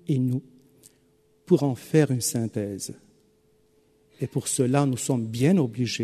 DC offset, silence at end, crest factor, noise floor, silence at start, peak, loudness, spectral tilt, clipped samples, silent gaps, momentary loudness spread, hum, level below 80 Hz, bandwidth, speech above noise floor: under 0.1%; 0 s; 20 dB; -63 dBFS; 0.1 s; -6 dBFS; -25 LUFS; -6 dB/octave; under 0.1%; none; 11 LU; none; -64 dBFS; 13.5 kHz; 39 dB